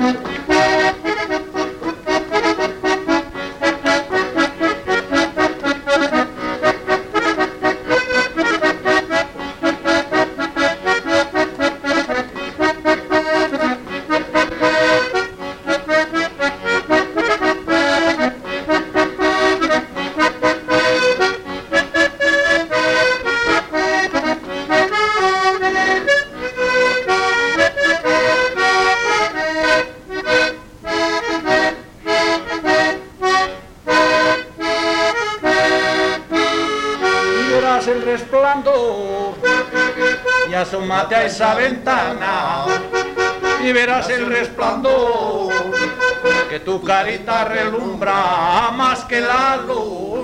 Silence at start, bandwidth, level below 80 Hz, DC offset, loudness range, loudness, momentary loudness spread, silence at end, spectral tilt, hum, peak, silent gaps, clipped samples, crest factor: 0 s; 16 kHz; -46 dBFS; under 0.1%; 3 LU; -17 LUFS; 6 LU; 0 s; -3.5 dB/octave; none; -2 dBFS; none; under 0.1%; 16 dB